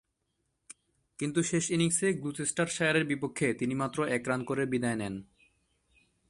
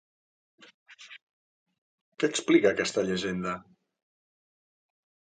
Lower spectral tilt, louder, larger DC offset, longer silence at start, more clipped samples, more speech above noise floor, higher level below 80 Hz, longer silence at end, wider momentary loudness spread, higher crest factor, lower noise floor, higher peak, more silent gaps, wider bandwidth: about the same, -4.5 dB/octave vs -4.5 dB/octave; second, -30 LUFS vs -27 LUFS; neither; second, 0.7 s vs 0.9 s; neither; second, 49 dB vs over 64 dB; about the same, -66 dBFS vs -68 dBFS; second, 1.05 s vs 1.8 s; second, 6 LU vs 25 LU; second, 18 dB vs 24 dB; second, -80 dBFS vs under -90 dBFS; second, -14 dBFS vs -8 dBFS; second, none vs 1.22-1.66 s, 1.78-2.12 s; first, 11.5 kHz vs 9.4 kHz